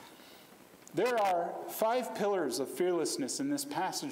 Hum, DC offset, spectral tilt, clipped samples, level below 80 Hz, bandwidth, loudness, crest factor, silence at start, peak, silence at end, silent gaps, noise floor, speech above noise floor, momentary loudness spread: none; under 0.1%; -3.5 dB/octave; under 0.1%; -84 dBFS; 16 kHz; -33 LUFS; 16 dB; 0 s; -16 dBFS; 0 s; none; -56 dBFS; 24 dB; 7 LU